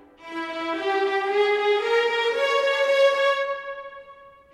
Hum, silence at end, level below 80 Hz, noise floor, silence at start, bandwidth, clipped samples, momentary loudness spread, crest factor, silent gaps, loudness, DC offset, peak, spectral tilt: none; 0.25 s; -68 dBFS; -48 dBFS; 0.2 s; 12.5 kHz; under 0.1%; 14 LU; 14 dB; none; -22 LUFS; under 0.1%; -8 dBFS; -1.5 dB/octave